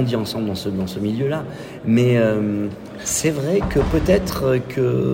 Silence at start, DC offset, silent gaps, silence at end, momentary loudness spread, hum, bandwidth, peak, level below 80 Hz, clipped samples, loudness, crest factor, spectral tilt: 0 s; under 0.1%; none; 0 s; 9 LU; none; 16.5 kHz; -4 dBFS; -36 dBFS; under 0.1%; -20 LUFS; 16 dB; -5.5 dB/octave